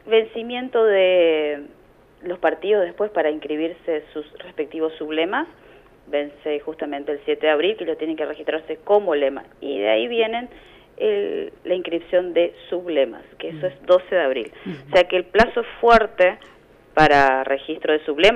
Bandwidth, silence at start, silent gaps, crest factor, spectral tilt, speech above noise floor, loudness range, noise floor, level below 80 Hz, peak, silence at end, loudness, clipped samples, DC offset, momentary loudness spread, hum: 9.4 kHz; 0.05 s; none; 16 dB; -5.5 dB/octave; 31 dB; 7 LU; -51 dBFS; -48 dBFS; -4 dBFS; 0 s; -21 LUFS; under 0.1%; under 0.1%; 14 LU; 50 Hz at -60 dBFS